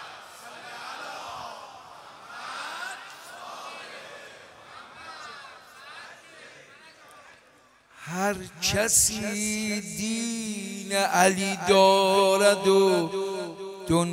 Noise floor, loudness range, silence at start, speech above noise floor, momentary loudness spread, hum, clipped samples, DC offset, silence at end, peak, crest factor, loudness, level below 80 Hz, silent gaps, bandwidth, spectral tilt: -58 dBFS; 22 LU; 0 s; 35 dB; 25 LU; none; under 0.1%; under 0.1%; 0 s; -6 dBFS; 22 dB; -24 LUFS; -58 dBFS; none; 16 kHz; -3 dB/octave